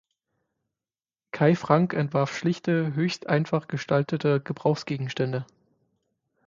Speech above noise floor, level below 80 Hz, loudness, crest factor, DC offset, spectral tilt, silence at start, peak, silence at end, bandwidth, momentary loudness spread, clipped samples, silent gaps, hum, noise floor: over 65 dB; -66 dBFS; -25 LUFS; 22 dB; under 0.1%; -7 dB/octave; 1.35 s; -6 dBFS; 1.05 s; 7.6 kHz; 7 LU; under 0.1%; none; none; under -90 dBFS